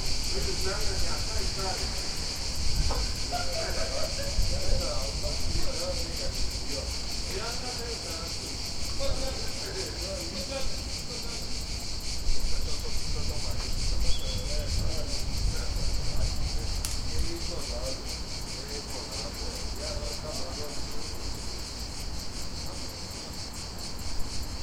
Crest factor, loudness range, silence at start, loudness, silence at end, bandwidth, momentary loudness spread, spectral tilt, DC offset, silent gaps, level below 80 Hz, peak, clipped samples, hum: 18 dB; 5 LU; 0 s; -32 LUFS; 0 s; 16 kHz; 6 LU; -3 dB/octave; under 0.1%; none; -34 dBFS; -10 dBFS; under 0.1%; none